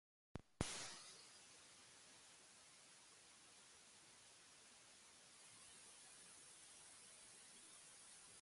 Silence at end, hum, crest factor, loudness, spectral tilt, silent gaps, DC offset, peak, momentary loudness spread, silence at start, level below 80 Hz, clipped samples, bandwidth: 0 s; none; 36 dB; -59 LUFS; -2.5 dB/octave; none; under 0.1%; -24 dBFS; 13 LU; 0.35 s; -74 dBFS; under 0.1%; 11.5 kHz